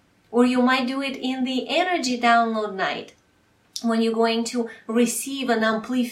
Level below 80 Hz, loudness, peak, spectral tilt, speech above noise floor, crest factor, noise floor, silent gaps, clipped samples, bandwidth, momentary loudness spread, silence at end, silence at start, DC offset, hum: -70 dBFS; -22 LUFS; -6 dBFS; -3 dB/octave; 39 dB; 18 dB; -61 dBFS; none; under 0.1%; 16 kHz; 8 LU; 0 s; 0.3 s; under 0.1%; none